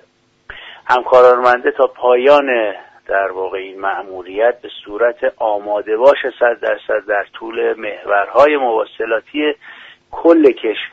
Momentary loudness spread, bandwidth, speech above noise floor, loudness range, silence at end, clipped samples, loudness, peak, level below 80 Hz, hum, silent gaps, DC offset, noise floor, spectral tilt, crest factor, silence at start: 15 LU; 7.6 kHz; 31 dB; 4 LU; 0.05 s; under 0.1%; -15 LUFS; 0 dBFS; -56 dBFS; none; none; under 0.1%; -45 dBFS; -5 dB/octave; 14 dB; 0.5 s